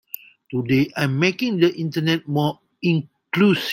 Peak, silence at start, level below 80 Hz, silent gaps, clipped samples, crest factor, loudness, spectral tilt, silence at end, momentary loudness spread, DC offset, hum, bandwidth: -4 dBFS; 0.5 s; -60 dBFS; none; under 0.1%; 18 dB; -21 LUFS; -6.5 dB/octave; 0 s; 9 LU; under 0.1%; none; 16.5 kHz